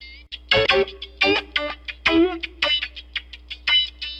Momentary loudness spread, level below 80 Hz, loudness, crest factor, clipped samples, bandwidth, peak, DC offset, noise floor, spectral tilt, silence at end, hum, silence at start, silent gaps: 14 LU; -44 dBFS; -20 LUFS; 18 dB; under 0.1%; 8.6 kHz; -4 dBFS; under 0.1%; -40 dBFS; -4 dB/octave; 0 s; none; 0 s; none